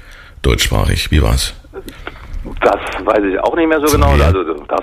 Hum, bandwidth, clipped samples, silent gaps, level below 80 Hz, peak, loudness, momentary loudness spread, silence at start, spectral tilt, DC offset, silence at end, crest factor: none; 15.5 kHz; under 0.1%; none; -20 dBFS; -2 dBFS; -14 LUFS; 19 LU; 0.05 s; -5 dB/octave; under 0.1%; 0 s; 14 dB